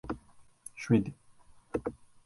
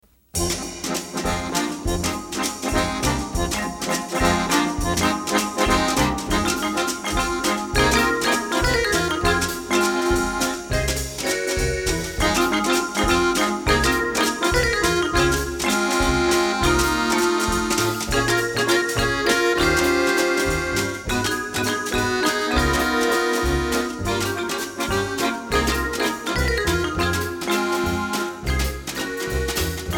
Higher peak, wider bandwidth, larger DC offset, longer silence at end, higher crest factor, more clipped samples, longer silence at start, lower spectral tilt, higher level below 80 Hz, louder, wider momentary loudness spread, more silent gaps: second, -12 dBFS vs -4 dBFS; second, 11.5 kHz vs 19.5 kHz; neither; first, 0.3 s vs 0 s; about the same, 22 dB vs 18 dB; neither; second, 0.05 s vs 0.35 s; first, -7.5 dB/octave vs -3.5 dB/octave; second, -56 dBFS vs -32 dBFS; second, -34 LUFS vs -21 LUFS; first, 18 LU vs 6 LU; neither